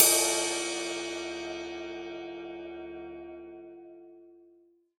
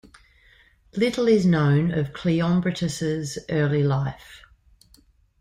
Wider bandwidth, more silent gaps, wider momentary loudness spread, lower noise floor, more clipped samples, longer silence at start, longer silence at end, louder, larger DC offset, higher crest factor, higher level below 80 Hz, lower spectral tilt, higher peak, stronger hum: first, over 20 kHz vs 13 kHz; neither; first, 22 LU vs 9 LU; first, -63 dBFS vs -58 dBFS; neither; second, 0 s vs 0.95 s; second, 0.6 s vs 1.05 s; second, -31 LUFS vs -23 LUFS; neither; first, 30 dB vs 16 dB; second, -66 dBFS vs -52 dBFS; second, 0 dB/octave vs -7 dB/octave; first, -4 dBFS vs -8 dBFS; neither